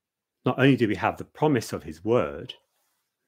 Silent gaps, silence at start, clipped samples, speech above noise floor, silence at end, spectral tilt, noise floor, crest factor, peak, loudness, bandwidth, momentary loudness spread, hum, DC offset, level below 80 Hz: none; 0.45 s; under 0.1%; 50 dB; 0.75 s; -6.5 dB/octave; -75 dBFS; 20 dB; -6 dBFS; -25 LUFS; 16 kHz; 16 LU; none; under 0.1%; -58 dBFS